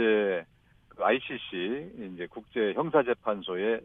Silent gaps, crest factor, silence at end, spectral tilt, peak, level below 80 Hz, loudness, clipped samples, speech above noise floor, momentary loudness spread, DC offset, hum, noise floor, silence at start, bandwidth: none; 20 dB; 0 s; -8 dB/octave; -10 dBFS; -66 dBFS; -30 LUFS; under 0.1%; 31 dB; 13 LU; under 0.1%; none; -60 dBFS; 0 s; 3.9 kHz